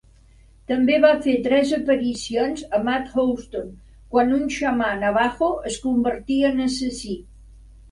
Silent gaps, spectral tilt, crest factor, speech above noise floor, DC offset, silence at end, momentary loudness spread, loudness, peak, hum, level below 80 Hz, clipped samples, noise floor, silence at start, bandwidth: none; -4.5 dB/octave; 20 dB; 30 dB; under 0.1%; 0.3 s; 11 LU; -21 LUFS; -2 dBFS; none; -46 dBFS; under 0.1%; -51 dBFS; 0.7 s; 11.5 kHz